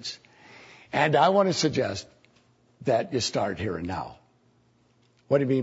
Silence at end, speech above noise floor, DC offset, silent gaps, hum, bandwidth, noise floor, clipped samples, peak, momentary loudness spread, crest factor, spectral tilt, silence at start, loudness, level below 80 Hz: 0 s; 39 dB; under 0.1%; none; none; 8 kHz; -64 dBFS; under 0.1%; -8 dBFS; 16 LU; 18 dB; -5 dB/octave; 0 s; -26 LUFS; -60 dBFS